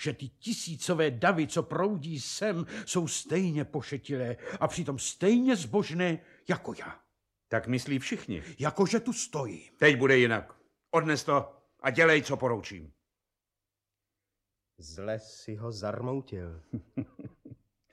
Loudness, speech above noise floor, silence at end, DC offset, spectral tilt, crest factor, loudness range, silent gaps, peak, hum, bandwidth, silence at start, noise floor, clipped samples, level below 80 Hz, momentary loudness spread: -29 LUFS; 59 dB; 0.4 s; under 0.1%; -4.5 dB/octave; 22 dB; 13 LU; none; -8 dBFS; none; 13.5 kHz; 0 s; -89 dBFS; under 0.1%; -62 dBFS; 17 LU